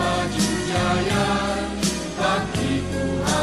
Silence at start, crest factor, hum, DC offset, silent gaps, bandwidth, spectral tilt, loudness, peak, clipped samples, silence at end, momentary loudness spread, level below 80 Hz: 0 s; 14 dB; none; under 0.1%; none; 13 kHz; -4.5 dB/octave; -22 LUFS; -8 dBFS; under 0.1%; 0 s; 3 LU; -38 dBFS